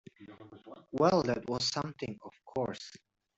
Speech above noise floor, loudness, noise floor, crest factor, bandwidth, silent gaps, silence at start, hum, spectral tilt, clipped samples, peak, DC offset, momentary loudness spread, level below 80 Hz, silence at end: 20 dB; -33 LUFS; -53 dBFS; 22 dB; 8.2 kHz; none; 0.2 s; none; -5 dB/octave; under 0.1%; -14 dBFS; under 0.1%; 25 LU; -66 dBFS; 0.4 s